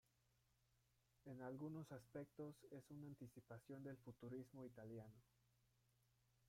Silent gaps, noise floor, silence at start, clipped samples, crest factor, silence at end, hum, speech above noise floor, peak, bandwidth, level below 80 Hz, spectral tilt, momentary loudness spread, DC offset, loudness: none; -84 dBFS; 1.25 s; under 0.1%; 16 dB; 0 s; none; 26 dB; -44 dBFS; 16 kHz; -86 dBFS; -8 dB/octave; 8 LU; under 0.1%; -58 LUFS